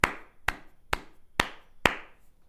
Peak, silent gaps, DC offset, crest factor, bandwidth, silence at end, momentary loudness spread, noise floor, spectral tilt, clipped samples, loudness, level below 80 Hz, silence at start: -2 dBFS; none; under 0.1%; 30 dB; 16 kHz; 0.4 s; 8 LU; -49 dBFS; -3 dB/octave; under 0.1%; -31 LUFS; -46 dBFS; 0.05 s